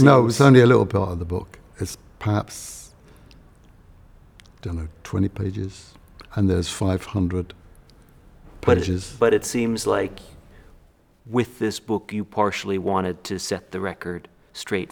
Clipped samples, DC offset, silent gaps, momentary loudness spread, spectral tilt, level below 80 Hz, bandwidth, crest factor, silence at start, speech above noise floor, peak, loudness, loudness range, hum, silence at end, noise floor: under 0.1%; under 0.1%; none; 18 LU; -6 dB/octave; -46 dBFS; 19 kHz; 22 dB; 0 s; 34 dB; -2 dBFS; -22 LUFS; 8 LU; none; 0.05 s; -55 dBFS